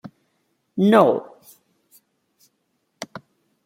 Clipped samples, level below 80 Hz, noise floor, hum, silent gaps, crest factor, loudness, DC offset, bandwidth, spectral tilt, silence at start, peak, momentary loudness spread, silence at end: under 0.1%; -72 dBFS; -71 dBFS; none; none; 22 dB; -17 LUFS; under 0.1%; 16 kHz; -7 dB/octave; 0.05 s; -2 dBFS; 23 LU; 0.45 s